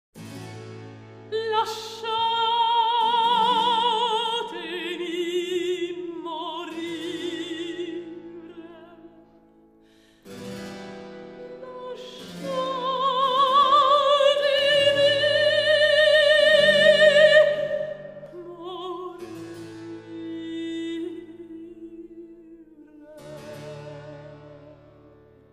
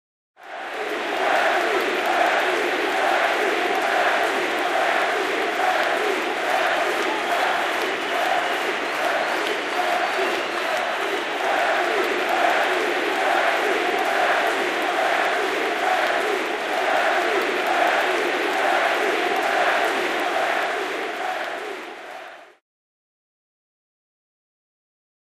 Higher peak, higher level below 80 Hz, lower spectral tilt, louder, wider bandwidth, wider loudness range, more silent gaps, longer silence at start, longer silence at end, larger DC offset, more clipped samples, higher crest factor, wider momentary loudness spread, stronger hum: about the same, -4 dBFS vs -6 dBFS; about the same, -64 dBFS vs -68 dBFS; first, -3.5 dB/octave vs -1.5 dB/octave; about the same, -21 LUFS vs -21 LUFS; second, 13 kHz vs 15.5 kHz; first, 24 LU vs 4 LU; neither; second, 0.15 s vs 0.4 s; second, 0.8 s vs 2.8 s; neither; neither; about the same, 20 dB vs 16 dB; first, 25 LU vs 6 LU; neither